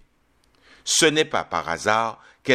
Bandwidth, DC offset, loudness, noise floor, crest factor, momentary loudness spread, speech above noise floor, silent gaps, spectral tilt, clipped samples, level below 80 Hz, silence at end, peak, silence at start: 15 kHz; under 0.1%; -21 LUFS; -63 dBFS; 22 dB; 14 LU; 41 dB; none; -2 dB/octave; under 0.1%; -60 dBFS; 0 s; -2 dBFS; 0.85 s